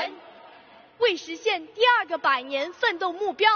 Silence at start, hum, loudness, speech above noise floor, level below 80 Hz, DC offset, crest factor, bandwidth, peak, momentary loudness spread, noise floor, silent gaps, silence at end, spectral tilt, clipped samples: 0 s; none; -24 LUFS; 27 dB; -76 dBFS; under 0.1%; 18 dB; 6.6 kHz; -6 dBFS; 8 LU; -51 dBFS; none; 0 s; 2.5 dB/octave; under 0.1%